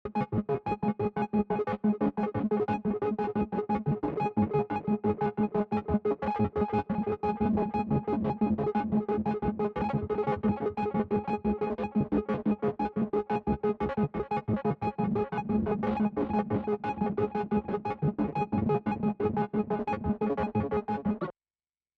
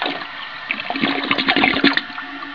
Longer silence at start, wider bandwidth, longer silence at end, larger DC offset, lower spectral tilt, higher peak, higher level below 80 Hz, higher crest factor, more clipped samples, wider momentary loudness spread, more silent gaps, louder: about the same, 0.05 s vs 0 s; about the same, 5 kHz vs 5.4 kHz; first, 0.65 s vs 0 s; second, under 0.1% vs 0.4%; first, -10 dB/octave vs -5 dB/octave; second, -16 dBFS vs 0 dBFS; about the same, -52 dBFS vs -54 dBFS; second, 14 dB vs 20 dB; neither; second, 3 LU vs 15 LU; neither; second, -30 LUFS vs -18 LUFS